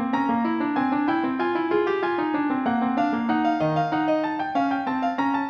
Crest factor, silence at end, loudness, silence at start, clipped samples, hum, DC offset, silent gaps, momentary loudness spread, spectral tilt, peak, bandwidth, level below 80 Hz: 12 dB; 0 s; -24 LUFS; 0 s; under 0.1%; none; under 0.1%; none; 2 LU; -7.5 dB/octave; -12 dBFS; 6.8 kHz; -64 dBFS